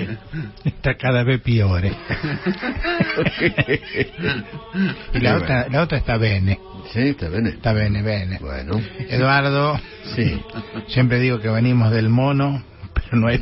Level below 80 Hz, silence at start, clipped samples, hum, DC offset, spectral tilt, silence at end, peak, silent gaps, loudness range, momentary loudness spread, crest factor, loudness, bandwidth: -36 dBFS; 0 s; under 0.1%; none; under 0.1%; -11 dB/octave; 0 s; -2 dBFS; none; 2 LU; 10 LU; 16 dB; -20 LUFS; 5.8 kHz